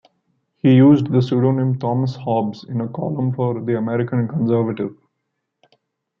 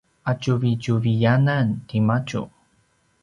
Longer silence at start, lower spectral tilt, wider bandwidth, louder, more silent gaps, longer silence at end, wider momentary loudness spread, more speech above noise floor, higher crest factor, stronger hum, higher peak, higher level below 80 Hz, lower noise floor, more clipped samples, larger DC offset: first, 0.65 s vs 0.25 s; first, -10 dB/octave vs -7.5 dB/octave; second, 6.2 kHz vs 7.2 kHz; first, -18 LUFS vs -22 LUFS; neither; first, 1.25 s vs 0.75 s; about the same, 12 LU vs 10 LU; first, 58 dB vs 43 dB; about the same, 16 dB vs 16 dB; neither; first, -2 dBFS vs -6 dBFS; second, -62 dBFS vs -54 dBFS; first, -76 dBFS vs -64 dBFS; neither; neither